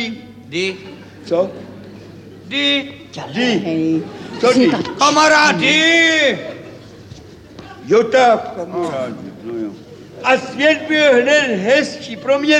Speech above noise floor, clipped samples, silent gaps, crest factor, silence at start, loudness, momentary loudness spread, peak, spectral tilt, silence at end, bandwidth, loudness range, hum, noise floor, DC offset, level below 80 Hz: 23 dB; under 0.1%; none; 16 dB; 0 s; -15 LUFS; 20 LU; -2 dBFS; -3.5 dB/octave; 0 s; 11.5 kHz; 7 LU; none; -38 dBFS; under 0.1%; -58 dBFS